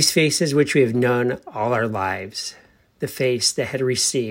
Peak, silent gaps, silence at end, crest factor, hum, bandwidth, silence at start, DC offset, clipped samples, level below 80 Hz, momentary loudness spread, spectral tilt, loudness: -4 dBFS; none; 0 s; 18 dB; none; 16.5 kHz; 0 s; under 0.1%; under 0.1%; -62 dBFS; 12 LU; -3.5 dB/octave; -20 LUFS